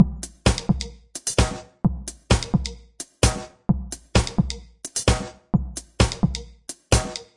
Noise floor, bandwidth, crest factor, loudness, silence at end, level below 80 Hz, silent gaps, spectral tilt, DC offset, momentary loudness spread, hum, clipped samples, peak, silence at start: -41 dBFS; 11.5 kHz; 22 dB; -24 LUFS; 0.15 s; -30 dBFS; none; -4.5 dB/octave; under 0.1%; 13 LU; none; under 0.1%; -2 dBFS; 0 s